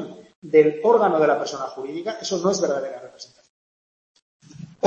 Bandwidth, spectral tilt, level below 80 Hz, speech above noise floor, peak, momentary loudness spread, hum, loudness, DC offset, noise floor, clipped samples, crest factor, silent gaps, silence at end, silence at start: 7.8 kHz; -4.5 dB/octave; -72 dBFS; over 69 dB; -4 dBFS; 25 LU; none; -21 LUFS; under 0.1%; under -90 dBFS; under 0.1%; 20 dB; 0.36-0.42 s, 3.50-4.15 s, 4.22-4.40 s; 0 s; 0 s